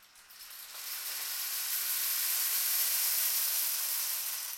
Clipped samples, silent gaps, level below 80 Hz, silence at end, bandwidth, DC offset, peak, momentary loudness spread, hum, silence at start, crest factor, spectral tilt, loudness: under 0.1%; none; -82 dBFS; 0 s; 16.5 kHz; under 0.1%; -18 dBFS; 14 LU; none; 0 s; 16 dB; 5 dB/octave; -29 LUFS